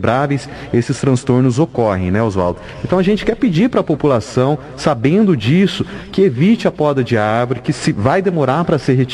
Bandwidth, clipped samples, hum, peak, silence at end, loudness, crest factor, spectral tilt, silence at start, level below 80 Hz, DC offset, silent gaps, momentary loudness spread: 11.5 kHz; under 0.1%; none; 0 dBFS; 0 s; -15 LUFS; 14 dB; -7 dB/octave; 0 s; -38 dBFS; under 0.1%; none; 6 LU